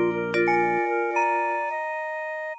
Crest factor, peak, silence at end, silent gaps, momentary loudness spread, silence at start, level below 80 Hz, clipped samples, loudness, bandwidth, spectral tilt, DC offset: 14 dB; -12 dBFS; 0 s; none; 8 LU; 0 s; -66 dBFS; under 0.1%; -24 LUFS; 8 kHz; -6 dB/octave; under 0.1%